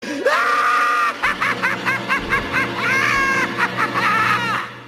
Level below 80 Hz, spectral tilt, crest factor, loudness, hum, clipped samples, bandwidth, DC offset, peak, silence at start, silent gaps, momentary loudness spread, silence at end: -46 dBFS; -3.5 dB/octave; 14 dB; -17 LUFS; none; under 0.1%; 14.5 kHz; under 0.1%; -4 dBFS; 0 s; none; 4 LU; 0 s